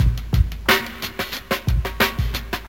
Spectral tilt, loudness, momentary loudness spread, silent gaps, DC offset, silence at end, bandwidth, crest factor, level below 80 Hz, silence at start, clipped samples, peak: -4.5 dB/octave; -22 LUFS; 8 LU; none; 0.3%; 0 s; 17 kHz; 20 dB; -26 dBFS; 0 s; under 0.1%; -2 dBFS